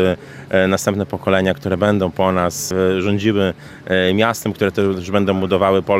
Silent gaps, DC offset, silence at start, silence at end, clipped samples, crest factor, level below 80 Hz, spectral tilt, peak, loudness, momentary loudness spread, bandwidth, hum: none; under 0.1%; 0 s; 0 s; under 0.1%; 16 dB; -50 dBFS; -5.5 dB/octave; 0 dBFS; -17 LUFS; 5 LU; 16 kHz; none